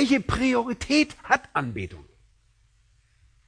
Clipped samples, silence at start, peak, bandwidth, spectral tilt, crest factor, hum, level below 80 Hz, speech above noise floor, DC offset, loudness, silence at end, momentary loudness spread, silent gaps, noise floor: under 0.1%; 0 s; -4 dBFS; 10.5 kHz; -4.5 dB/octave; 22 dB; none; -46 dBFS; 38 dB; under 0.1%; -24 LUFS; 1.45 s; 11 LU; none; -62 dBFS